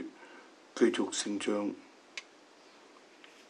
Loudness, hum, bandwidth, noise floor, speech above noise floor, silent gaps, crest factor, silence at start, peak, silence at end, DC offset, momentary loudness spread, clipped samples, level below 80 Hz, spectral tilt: -32 LUFS; none; 11 kHz; -59 dBFS; 27 dB; none; 24 dB; 0 s; -14 dBFS; 1.25 s; under 0.1%; 25 LU; under 0.1%; under -90 dBFS; -3 dB/octave